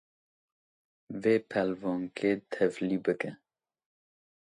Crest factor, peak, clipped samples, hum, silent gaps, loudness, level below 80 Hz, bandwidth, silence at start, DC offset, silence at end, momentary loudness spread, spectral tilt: 20 dB; -12 dBFS; under 0.1%; none; none; -31 LUFS; -72 dBFS; 11 kHz; 1.1 s; under 0.1%; 1.15 s; 7 LU; -7 dB/octave